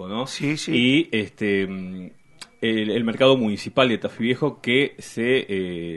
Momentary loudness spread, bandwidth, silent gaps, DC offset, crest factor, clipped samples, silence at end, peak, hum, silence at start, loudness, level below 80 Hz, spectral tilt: 9 LU; 11.5 kHz; none; under 0.1%; 22 dB; under 0.1%; 0 s; -2 dBFS; none; 0 s; -22 LUFS; -60 dBFS; -5.5 dB/octave